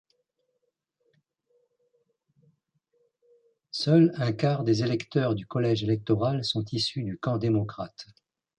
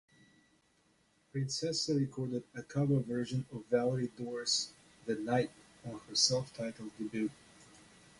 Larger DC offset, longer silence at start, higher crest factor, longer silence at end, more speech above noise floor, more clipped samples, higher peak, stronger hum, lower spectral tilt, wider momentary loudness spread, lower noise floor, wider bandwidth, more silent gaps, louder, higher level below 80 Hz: neither; first, 3.75 s vs 1.35 s; about the same, 20 dB vs 22 dB; about the same, 0.55 s vs 0.45 s; first, 53 dB vs 37 dB; neither; first, -10 dBFS vs -14 dBFS; neither; first, -7 dB/octave vs -4.5 dB/octave; about the same, 12 LU vs 13 LU; first, -79 dBFS vs -72 dBFS; second, 10 kHz vs 11.5 kHz; neither; first, -26 LUFS vs -35 LUFS; first, -62 dBFS vs -70 dBFS